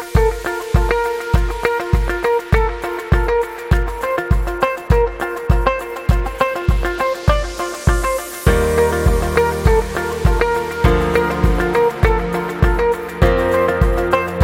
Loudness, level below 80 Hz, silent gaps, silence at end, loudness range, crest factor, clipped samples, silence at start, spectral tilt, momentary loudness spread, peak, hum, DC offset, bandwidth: -17 LUFS; -20 dBFS; none; 0 s; 2 LU; 16 dB; under 0.1%; 0 s; -6 dB/octave; 4 LU; 0 dBFS; none; under 0.1%; 16.5 kHz